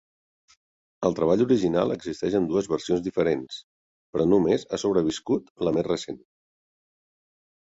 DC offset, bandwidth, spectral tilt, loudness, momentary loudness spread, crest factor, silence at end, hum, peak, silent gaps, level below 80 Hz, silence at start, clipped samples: under 0.1%; 8 kHz; -6.5 dB/octave; -25 LUFS; 9 LU; 18 dB; 1.5 s; none; -8 dBFS; 3.64-4.13 s, 5.50-5.56 s; -56 dBFS; 1 s; under 0.1%